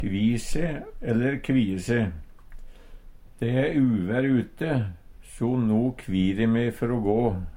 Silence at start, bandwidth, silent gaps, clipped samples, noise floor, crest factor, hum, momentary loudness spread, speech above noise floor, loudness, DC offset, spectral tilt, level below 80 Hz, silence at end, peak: 0 s; 16 kHz; none; under 0.1%; -44 dBFS; 16 dB; none; 7 LU; 20 dB; -25 LUFS; under 0.1%; -7.5 dB/octave; -40 dBFS; 0 s; -10 dBFS